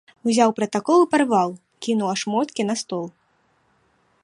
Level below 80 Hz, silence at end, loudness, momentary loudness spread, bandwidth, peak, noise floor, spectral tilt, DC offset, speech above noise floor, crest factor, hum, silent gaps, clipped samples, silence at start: -72 dBFS; 1.15 s; -21 LUFS; 12 LU; 11.5 kHz; -4 dBFS; -64 dBFS; -4.5 dB/octave; under 0.1%; 44 dB; 18 dB; none; none; under 0.1%; 0.25 s